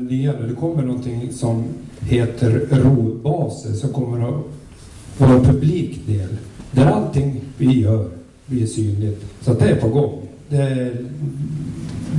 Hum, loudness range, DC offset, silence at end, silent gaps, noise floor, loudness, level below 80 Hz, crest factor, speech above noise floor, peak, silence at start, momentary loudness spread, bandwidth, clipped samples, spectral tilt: none; 3 LU; under 0.1%; 0 s; none; -38 dBFS; -19 LUFS; -40 dBFS; 12 dB; 21 dB; -6 dBFS; 0 s; 13 LU; 11.5 kHz; under 0.1%; -8 dB/octave